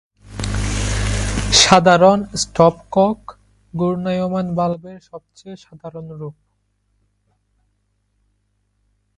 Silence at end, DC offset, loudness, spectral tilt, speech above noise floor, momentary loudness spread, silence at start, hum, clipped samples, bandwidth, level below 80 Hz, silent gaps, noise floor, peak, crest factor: 2.85 s; under 0.1%; -16 LUFS; -4 dB/octave; 50 dB; 26 LU; 0.25 s; none; under 0.1%; 11.5 kHz; -32 dBFS; none; -67 dBFS; 0 dBFS; 20 dB